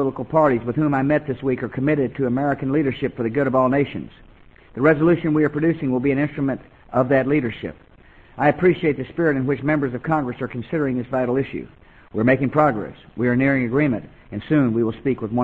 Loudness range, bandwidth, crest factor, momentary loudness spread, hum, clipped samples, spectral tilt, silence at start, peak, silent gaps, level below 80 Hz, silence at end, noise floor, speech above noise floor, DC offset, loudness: 2 LU; 4.5 kHz; 18 dB; 11 LU; none; under 0.1%; -10 dB/octave; 0 s; -2 dBFS; none; -50 dBFS; 0 s; -49 dBFS; 29 dB; under 0.1%; -21 LUFS